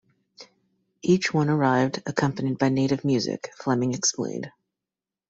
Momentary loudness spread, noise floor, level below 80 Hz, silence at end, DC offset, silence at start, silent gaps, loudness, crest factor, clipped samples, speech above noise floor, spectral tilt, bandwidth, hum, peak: 10 LU; -89 dBFS; -64 dBFS; 0.8 s; under 0.1%; 0.4 s; none; -24 LUFS; 20 dB; under 0.1%; 66 dB; -5 dB/octave; 8 kHz; none; -6 dBFS